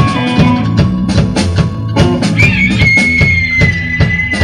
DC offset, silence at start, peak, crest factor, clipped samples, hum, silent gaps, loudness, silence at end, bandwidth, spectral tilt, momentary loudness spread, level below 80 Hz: under 0.1%; 0 s; 0 dBFS; 10 dB; 0.2%; none; none; -10 LUFS; 0 s; 11.5 kHz; -6 dB/octave; 5 LU; -24 dBFS